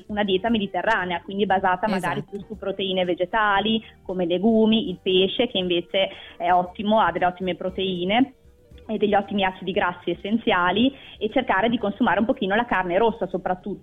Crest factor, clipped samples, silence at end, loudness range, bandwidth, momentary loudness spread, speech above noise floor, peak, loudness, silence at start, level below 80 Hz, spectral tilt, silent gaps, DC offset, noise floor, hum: 14 dB; under 0.1%; 0 s; 2 LU; 11.5 kHz; 8 LU; 26 dB; -10 dBFS; -23 LUFS; 0.1 s; -50 dBFS; -6.5 dB/octave; none; under 0.1%; -49 dBFS; none